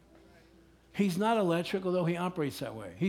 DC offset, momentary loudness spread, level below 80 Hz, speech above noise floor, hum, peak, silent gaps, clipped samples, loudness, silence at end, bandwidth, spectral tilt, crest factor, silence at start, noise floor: under 0.1%; 12 LU; -66 dBFS; 30 dB; none; -16 dBFS; none; under 0.1%; -31 LUFS; 0 s; 17.5 kHz; -6.5 dB/octave; 16 dB; 0.95 s; -60 dBFS